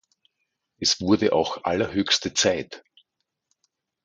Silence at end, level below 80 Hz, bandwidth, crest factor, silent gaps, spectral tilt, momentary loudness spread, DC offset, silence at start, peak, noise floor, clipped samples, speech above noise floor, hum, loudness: 1.25 s; -54 dBFS; 9.6 kHz; 20 dB; none; -3 dB/octave; 9 LU; under 0.1%; 0.8 s; -6 dBFS; -79 dBFS; under 0.1%; 56 dB; none; -22 LUFS